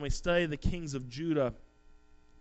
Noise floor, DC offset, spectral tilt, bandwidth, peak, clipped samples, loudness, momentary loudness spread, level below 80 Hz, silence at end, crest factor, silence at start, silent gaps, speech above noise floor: -58 dBFS; under 0.1%; -5.5 dB/octave; 8.2 kHz; -16 dBFS; under 0.1%; -33 LUFS; 8 LU; -42 dBFS; 0.8 s; 18 dB; 0 s; none; 26 dB